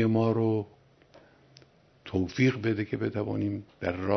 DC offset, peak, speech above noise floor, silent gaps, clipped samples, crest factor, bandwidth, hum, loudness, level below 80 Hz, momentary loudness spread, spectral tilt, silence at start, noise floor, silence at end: under 0.1%; -10 dBFS; 31 dB; none; under 0.1%; 18 dB; 6.4 kHz; none; -29 LUFS; -62 dBFS; 9 LU; -8 dB/octave; 0 s; -58 dBFS; 0 s